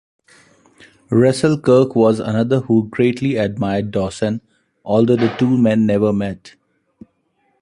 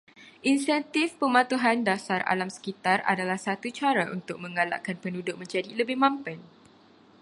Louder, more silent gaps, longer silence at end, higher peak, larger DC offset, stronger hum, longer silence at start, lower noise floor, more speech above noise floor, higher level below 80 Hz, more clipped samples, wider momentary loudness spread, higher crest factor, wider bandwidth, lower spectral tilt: first, -16 LUFS vs -27 LUFS; neither; first, 1.15 s vs 0.8 s; first, 0 dBFS vs -6 dBFS; neither; neither; first, 1.1 s vs 0.2 s; first, -64 dBFS vs -56 dBFS; first, 48 dB vs 29 dB; first, -50 dBFS vs -76 dBFS; neither; about the same, 9 LU vs 10 LU; second, 16 dB vs 22 dB; about the same, 11 kHz vs 11.5 kHz; first, -7.5 dB/octave vs -4.5 dB/octave